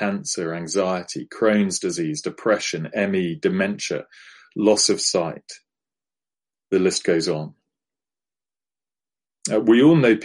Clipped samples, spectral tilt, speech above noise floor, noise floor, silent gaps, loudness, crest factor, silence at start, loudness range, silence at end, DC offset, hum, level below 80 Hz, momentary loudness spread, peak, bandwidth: under 0.1%; -4 dB/octave; over 69 dB; under -90 dBFS; none; -21 LUFS; 18 dB; 0 s; 5 LU; 0 s; under 0.1%; none; -66 dBFS; 13 LU; -4 dBFS; 11.5 kHz